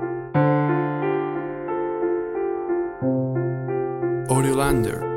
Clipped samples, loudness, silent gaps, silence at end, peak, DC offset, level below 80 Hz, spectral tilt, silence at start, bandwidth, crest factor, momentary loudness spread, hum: under 0.1%; -23 LUFS; none; 0 s; -6 dBFS; under 0.1%; -44 dBFS; -7 dB/octave; 0 s; 16.5 kHz; 16 dB; 6 LU; none